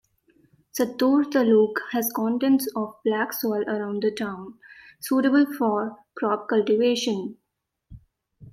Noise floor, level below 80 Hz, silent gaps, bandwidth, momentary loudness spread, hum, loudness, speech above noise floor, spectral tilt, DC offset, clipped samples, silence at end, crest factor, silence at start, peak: -80 dBFS; -64 dBFS; none; 16.5 kHz; 12 LU; none; -23 LUFS; 57 dB; -4.5 dB/octave; under 0.1%; under 0.1%; 0.05 s; 16 dB; 0.75 s; -8 dBFS